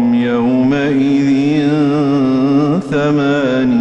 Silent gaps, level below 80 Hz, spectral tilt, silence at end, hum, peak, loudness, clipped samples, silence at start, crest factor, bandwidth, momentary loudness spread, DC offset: none; -48 dBFS; -7.5 dB/octave; 0 s; none; -4 dBFS; -13 LUFS; under 0.1%; 0 s; 8 dB; 8.2 kHz; 1 LU; under 0.1%